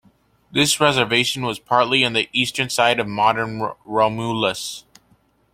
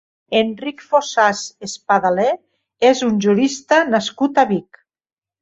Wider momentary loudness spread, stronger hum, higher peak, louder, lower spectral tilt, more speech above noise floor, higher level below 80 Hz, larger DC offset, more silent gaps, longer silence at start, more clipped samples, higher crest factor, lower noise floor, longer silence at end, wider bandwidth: about the same, 9 LU vs 10 LU; neither; about the same, -2 dBFS vs -2 dBFS; about the same, -19 LUFS vs -17 LUFS; second, -3 dB/octave vs -4.5 dB/octave; second, 40 dB vs over 73 dB; first, -56 dBFS vs -62 dBFS; neither; neither; first, 0.55 s vs 0.3 s; neither; about the same, 20 dB vs 16 dB; second, -60 dBFS vs under -90 dBFS; about the same, 0.75 s vs 0.8 s; first, 16.5 kHz vs 8 kHz